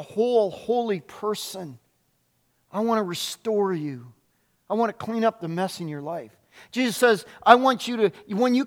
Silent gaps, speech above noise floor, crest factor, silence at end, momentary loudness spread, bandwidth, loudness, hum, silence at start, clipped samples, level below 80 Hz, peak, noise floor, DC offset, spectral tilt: none; 45 dB; 24 dB; 0 s; 16 LU; 17.5 kHz; -24 LUFS; none; 0 s; under 0.1%; -70 dBFS; 0 dBFS; -69 dBFS; under 0.1%; -4.5 dB/octave